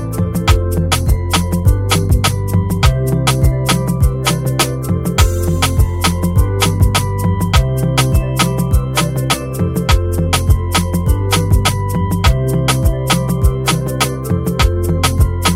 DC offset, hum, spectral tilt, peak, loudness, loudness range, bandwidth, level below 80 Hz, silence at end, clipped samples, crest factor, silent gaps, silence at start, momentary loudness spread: under 0.1%; none; -5 dB/octave; 0 dBFS; -15 LUFS; 1 LU; 16.5 kHz; -20 dBFS; 0 s; under 0.1%; 14 dB; none; 0 s; 3 LU